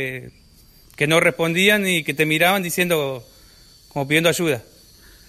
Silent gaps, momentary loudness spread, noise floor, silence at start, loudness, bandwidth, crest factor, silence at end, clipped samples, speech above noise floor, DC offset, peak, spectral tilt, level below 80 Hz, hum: none; 13 LU; -50 dBFS; 0 s; -18 LUFS; 15.5 kHz; 18 dB; 0.65 s; under 0.1%; 31 dB; under 0.1%; -4 dBFS; -4 dB/octave; -54 dBFS; none